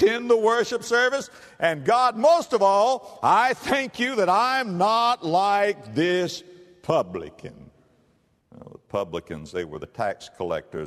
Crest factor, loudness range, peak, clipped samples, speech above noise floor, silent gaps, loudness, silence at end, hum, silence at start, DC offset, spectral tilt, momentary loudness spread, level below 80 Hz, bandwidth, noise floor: 18 dB; 12 LU; -6 dBFS; under 0.1%; 42 dB; none; -23 LUFS; 0 s; none; 0 s; under 0.1%; -4.5 dB/octave; 14 LU; -60 dBFS; 13.5 kHz; -64 dBFS